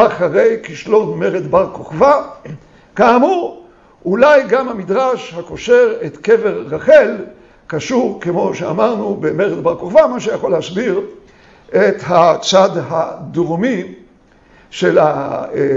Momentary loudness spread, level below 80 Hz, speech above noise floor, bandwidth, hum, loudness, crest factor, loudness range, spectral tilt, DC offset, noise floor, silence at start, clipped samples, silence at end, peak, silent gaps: 13 LU; -50 dBFS; 34 dB; 7.8 kHz; none; -14 LUFS; 14 dB; 2 LU; -5.5 dB/octave; under 0.1%; -47 dBFS; 0 s; under 0.1%; 0 s; 0 dBFS; none